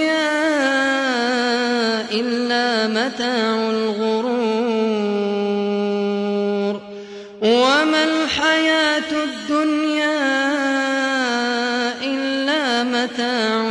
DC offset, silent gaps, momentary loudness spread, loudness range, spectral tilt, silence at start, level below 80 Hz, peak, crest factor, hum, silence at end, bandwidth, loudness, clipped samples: under 0.1%; none; 5 LU; 3 LU; -3.5 dB/octave; 0 s; -60 dBFS; -4 dBFS; 14 dB; none; 0 s; 10.5 kHz; -19 LUFS; under 0.1%